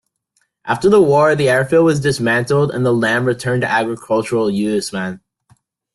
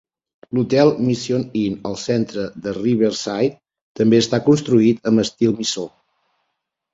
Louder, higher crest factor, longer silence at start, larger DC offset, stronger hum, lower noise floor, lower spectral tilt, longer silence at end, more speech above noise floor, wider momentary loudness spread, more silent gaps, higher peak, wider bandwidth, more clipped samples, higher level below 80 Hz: first, -15 LUFS vs -19 LUFS; about the same, 14 dB vs 18 dB; first, 0.65 s vs 0.5 s; neither; neither; second, -66 dBFS vs -76 dBFS; about the same, -6 dB/octave vs -6 dB/octave; second, 0.75 s vs 1.05 s; second, 51 dB vs 58 dB; about the same, 11 LU vs 10 LU; second, none vs 3.82-3.95 s; about the same, -2 dBFS vs -2 dBFS; first, 12.5 kHz vs 7.8 kHz; neither; about the same, -52 dBFS vs -56 dBFS